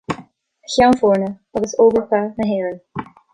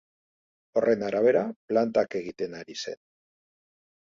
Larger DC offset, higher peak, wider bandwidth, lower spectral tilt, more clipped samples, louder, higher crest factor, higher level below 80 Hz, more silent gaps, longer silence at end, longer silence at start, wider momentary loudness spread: neither; first, -2 dBFS vs -10 dBFS; first, 11 kHz vs 7.6 kHz; about the same, -5.5 dB/octave vs -5.5 dB/octave; neither; first, -17 LUFS vs -27 LUFS; about the same, 16 dB vs 18 dB; first, -48 dBFS vs -70 dBFS; second, none vs 1.56-1.68 s; second, 0.3 s vs 1.1 s; second, 0.1 s vs 0.75 s; first, 16 LU vs 13 LU